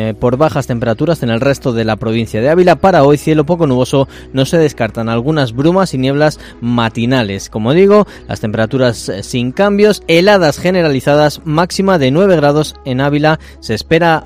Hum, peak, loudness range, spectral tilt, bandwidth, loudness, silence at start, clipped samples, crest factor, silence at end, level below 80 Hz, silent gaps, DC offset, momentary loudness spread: none; 0 dBFS; 3 LU; -6 dB/octave; 16 kHz; -12 LUFS; 0 s; 0.4%; 12 dB; 0 s; -36 dBFS; none; under 0.1%; 9 LU